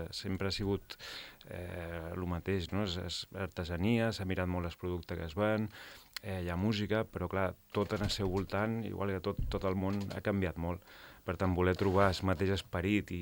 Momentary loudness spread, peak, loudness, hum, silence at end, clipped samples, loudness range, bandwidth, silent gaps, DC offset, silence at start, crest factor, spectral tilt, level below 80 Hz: 11 LU; -12 dBFS; -35 LUFS; none; 0 s; under 0.1%; 4 LU; 17 kHz; none; under 0.1%; 0 s; 22 dB; -6.5 dB/octave; -52 dBFS